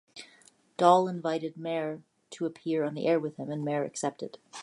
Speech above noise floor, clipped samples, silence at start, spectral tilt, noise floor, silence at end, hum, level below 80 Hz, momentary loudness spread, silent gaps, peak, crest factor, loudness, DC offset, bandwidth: 32 dB; under 0.1%; 0.15 s; -5.5 dB/octave; -61 dBFS; 0 s; none; -82 dBFS; 22 LU; none; -8 dBFS; 22 dB; -29 LUFS; under 0.1%; 11.5 kHz